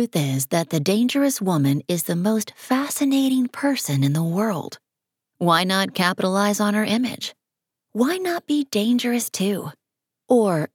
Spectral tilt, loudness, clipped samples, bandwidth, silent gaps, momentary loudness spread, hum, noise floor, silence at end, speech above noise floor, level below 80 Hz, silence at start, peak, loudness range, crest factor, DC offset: -5 dB/octave; -21 LUFS; under 0.1%; 18.5 kHz; none; 6 LU; none; -85 dBFS; 0.1 s; 64 dB; -72 dBFS; 0 s; -4 dBFS; 2 LU; 18 dB; under 0.1%